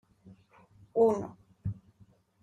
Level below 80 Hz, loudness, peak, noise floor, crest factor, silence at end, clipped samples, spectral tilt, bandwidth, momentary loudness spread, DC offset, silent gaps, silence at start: -62 dBFS; -31 LUFS; -14 dBFS; -63 dBFS; 20 dB; 0.7 s; under 0.1%; -9 dB/octave; 7.8 kHz; 18 LU; under 0.1%; none; 0.95 s